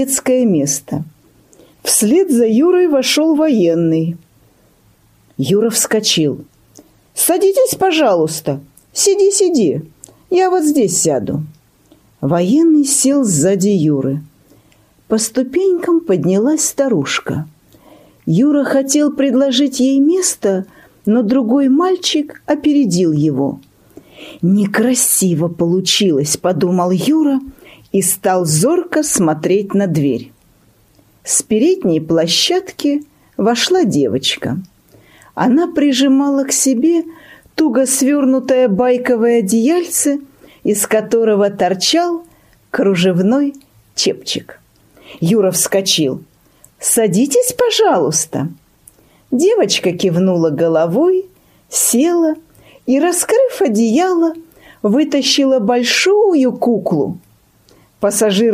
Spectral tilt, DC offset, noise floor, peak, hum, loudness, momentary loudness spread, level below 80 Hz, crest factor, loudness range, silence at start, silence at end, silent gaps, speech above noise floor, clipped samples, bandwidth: -4 dB/octave; under 0.1%; -52 dBFS; 0 dBFS; none; -14 LUFS; 10 LU; -56 dBFS; 14 dB; 2 LU; 0 s; 0 s; none; 38 dB; under 0.1%; 15.5 kHz